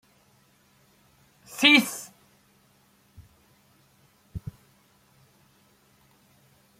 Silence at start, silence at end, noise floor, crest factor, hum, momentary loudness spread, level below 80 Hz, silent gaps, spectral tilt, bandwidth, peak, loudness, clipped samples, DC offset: 1.5 s; 2.4 s; -62 dBFS; 26 dB; none; 27 LU; -60 dBFS; none; -2.5 dB/octave; 16.5 kHz; -6 dBFS; -20 LUFS; under 0.1%; under 0.1%